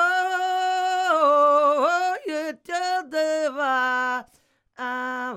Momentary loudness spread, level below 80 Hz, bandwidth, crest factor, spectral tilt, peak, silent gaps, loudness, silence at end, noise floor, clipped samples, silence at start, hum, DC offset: 12 LU; -76 dBFS; 14.5 kHz; 14 dB; -1.5 dB/octave; -8 dBFS; none; -22 LUFS; 0 s; -63 dBFS; under 0.1%; 0 s; none; under 0.1%